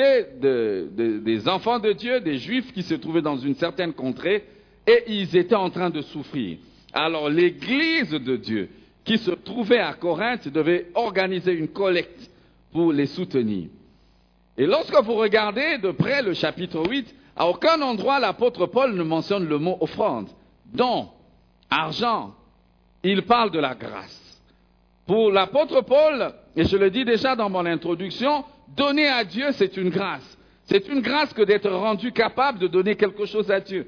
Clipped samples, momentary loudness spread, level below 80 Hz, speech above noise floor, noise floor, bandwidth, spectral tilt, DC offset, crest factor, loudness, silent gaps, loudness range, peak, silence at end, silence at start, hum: under 0.1%; 10 LU; -56 dBFS; 37 dB; -59 dBFS; 5.4 kHz; -6.5 dB/octave; under 0.1%; 18 dB; -22 LUFS; none; 3 LU; -6 dBFS; 0.05 s; 0 s; none